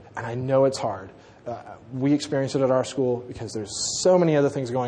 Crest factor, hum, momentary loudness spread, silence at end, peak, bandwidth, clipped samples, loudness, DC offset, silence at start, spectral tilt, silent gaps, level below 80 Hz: 18 dB; none; 17 LU; 0 s; -6 dBFS; 10 kHz; under 0.1%; -23 LUFS; under 0.1%; 0 s; -5 dB/octave; none; -60 dBFS